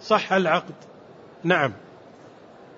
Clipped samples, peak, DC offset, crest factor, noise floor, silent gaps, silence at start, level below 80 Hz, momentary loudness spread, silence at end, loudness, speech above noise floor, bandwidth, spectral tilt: under 0.1%; -6 dBFS; under 0.1%; 20 dB; -47 dBFS; none; 0 s; -70 dBFS; 23 LU; 1 s; -23 LUFS; 25 dB; 7.8 kHz; -5.5 dB/octave